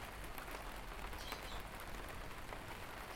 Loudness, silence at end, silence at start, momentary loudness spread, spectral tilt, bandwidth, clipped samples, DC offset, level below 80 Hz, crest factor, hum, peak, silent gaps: -49 LUFS; 0 s; 0 s; 3 LU; -3.5 dB/octave; 16.5 kHz; under 0.1%; under 0.1%; -54 dBFS; 20 dB; none; -28 dBFS; none